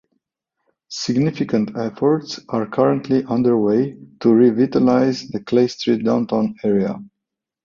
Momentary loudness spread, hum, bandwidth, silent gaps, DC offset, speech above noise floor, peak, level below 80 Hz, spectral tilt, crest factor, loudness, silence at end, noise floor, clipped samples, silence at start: 10 LU; none; 7.4 kHz; none; under 0.1%; 65 dB; -2 dBFS; -58 dBFS; -7 dB/octave; 16 dB; -18 LUFS; 0.6 s; -82 dBFS; under 0.1%; 0.9 s